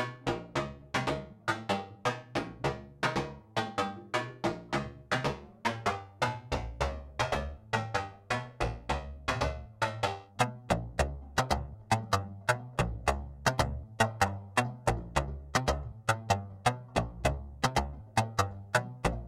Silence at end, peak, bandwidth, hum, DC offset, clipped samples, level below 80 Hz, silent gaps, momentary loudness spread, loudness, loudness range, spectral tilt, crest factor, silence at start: 0 s; -12 dBFS; 16.5 kHz; none; under 0.1%; under 0.1%; -44 dBFS; none; 6 LU; -33 LUFS; 3 LU; -4.5 dB/octave; 22 dB; 0 s